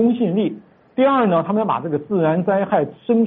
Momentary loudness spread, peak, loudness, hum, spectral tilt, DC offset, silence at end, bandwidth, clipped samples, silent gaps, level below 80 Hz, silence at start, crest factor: 7 LU; -6 dBFS; -19 LUFS; none; -6.5 dB/octave; under 0.1%; 0 s; 4 kHz; under 0.1%; none; -62 dBFS; 0 s; 12 dB